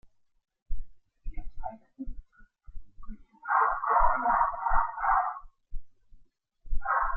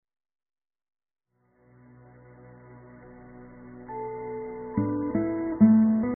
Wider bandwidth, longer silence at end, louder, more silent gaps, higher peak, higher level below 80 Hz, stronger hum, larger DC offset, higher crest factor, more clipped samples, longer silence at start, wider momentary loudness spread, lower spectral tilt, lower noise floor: about the same, 2.5 kHz vs 2.3 kHz; about the same, 0 s vs 0 s; about the same, -27 LUFS vs -25 LUFS; neither; about the same, -10 dBFS vs -8 dBFS; first, -40 dBFS vs -58 dBFS; second, none vs 60 Hz at -70 dBFS; neither; about the same, 18 dB vs 20 dB; neither; second, 0.7 s vs 2.7 s; second, 21 LU vs 28 LU; first, -10 dB/octave vs -7.5 dB/octave; second, -58 dBFS vs -65 dBFS